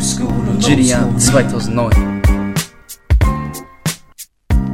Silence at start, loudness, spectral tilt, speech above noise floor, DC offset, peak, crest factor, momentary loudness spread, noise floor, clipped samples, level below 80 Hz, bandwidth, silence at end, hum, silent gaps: 0 s; -15 LUFS; -5 dB/octave; 27 dB; under 0.1%; 0 dBFS; 14 dB; 16 LU; -39 dBFS; under 0.1%; -20 dBFS; 16.5 kHz; 0 s; none; none